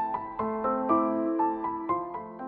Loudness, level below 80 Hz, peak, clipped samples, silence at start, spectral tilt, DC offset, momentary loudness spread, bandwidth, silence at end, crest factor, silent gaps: -29 LUFS; -62 dBFS; -12 dBFS; under 0.1%; 0 s; -10.5 dB/octave; under 0.1%; 7 LU; 3.8 kHz; 0 s; 16 dB; none